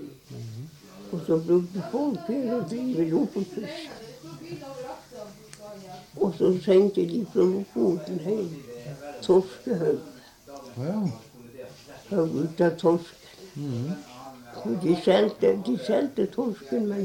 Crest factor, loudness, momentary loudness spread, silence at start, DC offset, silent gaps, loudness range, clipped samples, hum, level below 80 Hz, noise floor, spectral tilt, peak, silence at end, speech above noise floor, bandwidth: 18 dB; -26 LUFS; 21 LU; 0 s; under 0.1%; none; 6 LU; under 0.1%; none; -66 dBFS; -46 dBFS; -7 dB/octave; -8 dBFS; 0 s; 21 dB; 16.5 kHz